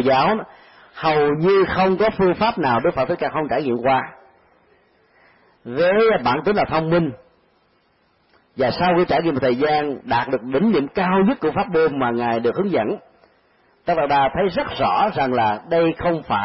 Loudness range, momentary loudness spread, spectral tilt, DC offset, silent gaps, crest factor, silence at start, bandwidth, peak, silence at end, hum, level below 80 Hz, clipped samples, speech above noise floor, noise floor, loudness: 3 LU; 6 LU; -11 dB/octave; under 0.1%; none; 12 dB; 0 s; 5.8 kHz; -6 dBFS; 0 s; none; -48 dBFS; under 0.1%; 43 dB; -61 dBFS; -19 LUFS